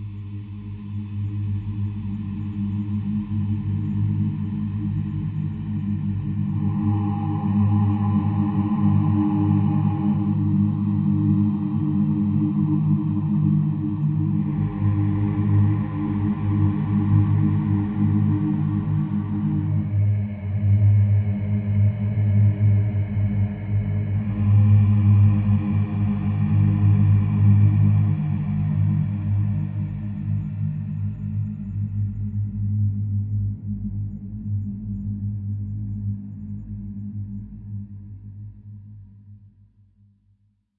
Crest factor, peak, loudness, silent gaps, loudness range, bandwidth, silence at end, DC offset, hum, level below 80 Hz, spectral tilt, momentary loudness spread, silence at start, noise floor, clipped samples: 14 dB; -6 dBFS; -22 LUFS; none; 10 LU; 3.2 kHz; 1.4 s; under 0.1%; none; -44 dBFS; -13.5 dB/octave; 12 LU; 0 s; -63 dBFS; under 0.1%